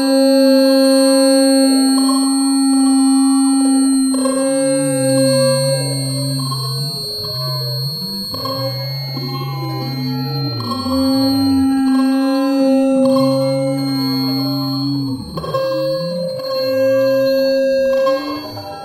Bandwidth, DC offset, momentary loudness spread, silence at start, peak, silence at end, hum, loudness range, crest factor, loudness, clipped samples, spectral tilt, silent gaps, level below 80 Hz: 14 kHz; under 0.1%; 10 LU; 0 s; -2 dBFS; 0 s; none; 8 LU; 12 dB; -15 LUFS; under 0.1%; -5 dB/octave; none; -52 dBFS